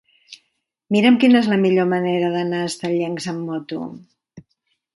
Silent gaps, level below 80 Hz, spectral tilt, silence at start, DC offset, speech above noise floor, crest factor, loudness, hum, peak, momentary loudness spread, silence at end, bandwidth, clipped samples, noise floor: none; -66 dBFS; -6 dB/octave; 0.3 s; under 0.1%; 53 dB; 18 dB; -19 LUFS; none; -2 dBFS; 14 LU; 0.55 s; 11.5 kHz; under 0.1%; -71 dBFS